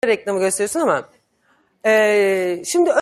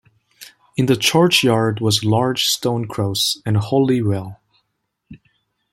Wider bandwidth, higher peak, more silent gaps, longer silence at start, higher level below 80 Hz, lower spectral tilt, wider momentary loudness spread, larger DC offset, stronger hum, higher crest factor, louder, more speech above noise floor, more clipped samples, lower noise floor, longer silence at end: about the same, 15.5 kHz vs 16.5 kHz; about the same, -2 dBFS vs -2 dBFS; neither; second, 0.05 s vs 0.4 s; second, -66 dBFS vs -56 dBFS; about the same, -3.5 dB/octave vs -4.5 dB/octave; second, 6 LU vs 9 LU; neither; neither; about the same, 16 dB vs 18 dB; about the same, -18 LUFS vs -17 LUFS; second, 44 dB vs 56 dB; neither; second, -61 dBFS vs -73 dBFS; second, 0 s vs 0.55 s